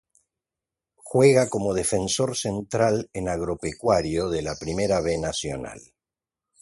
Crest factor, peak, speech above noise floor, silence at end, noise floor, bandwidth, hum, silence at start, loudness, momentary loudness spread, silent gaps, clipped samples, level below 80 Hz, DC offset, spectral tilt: 20 dB; -4 dBFS; 66 dB; 0.8 s; -90 dBFS; 12 kHz; none; 1.05 s; -24 LUFS; 11 LU; none; under 0.1%; -48 dBFS; under 0.1%; -4.5 dB/octave